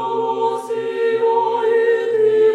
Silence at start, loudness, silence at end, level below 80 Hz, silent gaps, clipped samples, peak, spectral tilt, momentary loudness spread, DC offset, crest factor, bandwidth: 0 s; -18 LUFS; 0 s; -80 dBFS; none; under 0.1%; -6 dBFS; -5 dB/octave; 5 LU; under 0.1%; 10 dB; 9.8 kHz